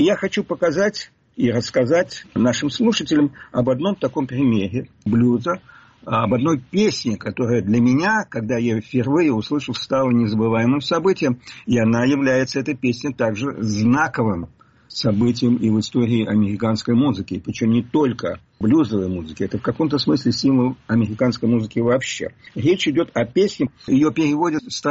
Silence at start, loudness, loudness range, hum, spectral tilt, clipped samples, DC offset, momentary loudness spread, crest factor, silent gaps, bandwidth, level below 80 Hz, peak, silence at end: 0 s; -20 LUFS; 1 LU; none; -5.5 dB/octave; under 0.1%; under 0.1%; 7 LU; 12 dB; none; 8 kHz; -52 dBFS; -6 dBFS; 0 s